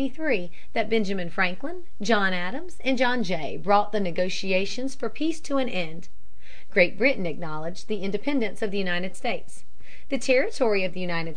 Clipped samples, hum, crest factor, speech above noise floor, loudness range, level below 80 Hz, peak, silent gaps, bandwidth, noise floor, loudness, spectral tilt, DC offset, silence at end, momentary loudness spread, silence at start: under 0.1%; none; 22 dB; 25 dB; 2 LU; -56 dBFS; -6 dBFS; none; 11 kHz; -52 dBFS; -26 LUFS; -5 dB/octave; 7%; 0.05 s; 10 LU; 0 s